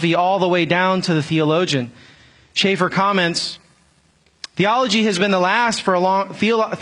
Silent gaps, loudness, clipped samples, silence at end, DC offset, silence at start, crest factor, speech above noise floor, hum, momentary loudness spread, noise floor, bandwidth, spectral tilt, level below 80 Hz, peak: none; -17 LUFS; under 0.1%; 0 s; under 0.1%; 0 s; 16 dB; 40 dB; none; 7 LU; -57 dBFS; 11 kHz; -4.5 dB/octave; -60 dBFS; -2 dBFS